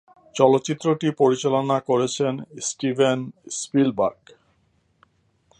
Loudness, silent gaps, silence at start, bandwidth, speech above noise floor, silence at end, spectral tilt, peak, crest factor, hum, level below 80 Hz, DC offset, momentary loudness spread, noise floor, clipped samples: -22 LUFS; none; 0.35 s; 11 kHz; 44 dB; 1.45 s; -5 dB/octave; -2 dBFS; 20 dB; none; -66 dBFS; under 0.1%; 10 LU; -65 dBFS; under 0.1%